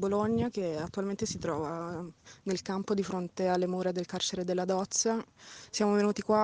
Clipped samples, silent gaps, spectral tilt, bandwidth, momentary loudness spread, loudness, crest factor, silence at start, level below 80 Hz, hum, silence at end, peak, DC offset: under 0.1%; none; -4.5 dB/octave; 10 kHz; 10 LU; -32 LUFS; 18 dB; 0 s; -64 dBFS; none; 0 s; -14 dBFS; under 0.1%